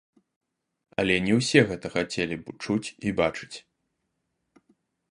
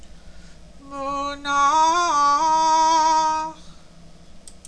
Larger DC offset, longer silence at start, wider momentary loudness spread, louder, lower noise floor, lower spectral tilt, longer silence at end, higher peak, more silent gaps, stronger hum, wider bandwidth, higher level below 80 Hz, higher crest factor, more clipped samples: second, under 0.1% vs 0.4%; first, 1 s vs 0 s; first, 15 LU vs 12 LU; second, -26 LUFS vs -19 LUFS; first, -78 dBFS vs -46 dBFS; first, -5 dB/octave vs -1.5 dB/octave; first, 1.55 s vs 0.15 s; first, -4 dBFS vs -8 dBFS; neither; neither; first, 11.5 kHz vs 10 kHz; second, -56 dBFS vs -48 dBFS; first, 24 dB vs 12 dB; neither